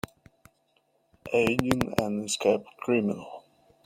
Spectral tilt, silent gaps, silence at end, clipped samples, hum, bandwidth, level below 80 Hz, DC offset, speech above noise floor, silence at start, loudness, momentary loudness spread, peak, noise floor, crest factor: -5 dB/octave; none; 0.45 s; under 0.1%; none; 16.5 kHz; -58 dBFS; under 0.1%; 43 dB; 1.25 s; -27 LUFS; 19 LU; -4 dBFS; -70 dBFS; 26 dB